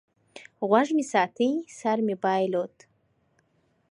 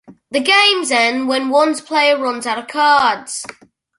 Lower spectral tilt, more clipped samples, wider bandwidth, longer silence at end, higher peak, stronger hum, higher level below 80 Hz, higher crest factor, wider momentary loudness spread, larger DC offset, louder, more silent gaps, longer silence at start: first, -5.5 dB/octave vs -1 dB/octave; neither; about the same, 11 kHz vs 11.5 kHz; first, 1.25 s vs 0.5 s; second, -6 dBFS vs -2 dBFS; neither; second, -78 dBFS vs -64 dBFS; first, 22 dB vs 16 dB; second, 8 LU vs 12 LU; neither; second, -26 LUFS vs -14 LUFS; neither; first, 0.35 s vs 0.1 s